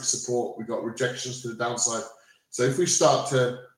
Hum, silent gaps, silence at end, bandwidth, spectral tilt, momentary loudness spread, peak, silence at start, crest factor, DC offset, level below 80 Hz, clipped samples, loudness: none; none; 0.1 s; 16 kHz; -3.5 dB/octave; 12 LU; -6 dBFS; 0 s; 20 dB; under 0.1%; -70 dBFS; under 0.1%; -25 LUFS